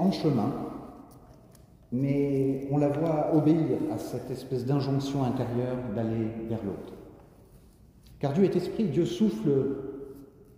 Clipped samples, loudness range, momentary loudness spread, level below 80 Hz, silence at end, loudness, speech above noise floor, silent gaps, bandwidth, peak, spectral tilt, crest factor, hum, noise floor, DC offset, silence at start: under 0.1%; 4 LU; 15 LU; -56 dBFS; 0.3 s; -28 LUFS; 28 dB; none; 15.5 kHz; -12 dBFS; -8.5 dB/octave; 16 dB; none; -55 dBFS; under 0.1%; 0 s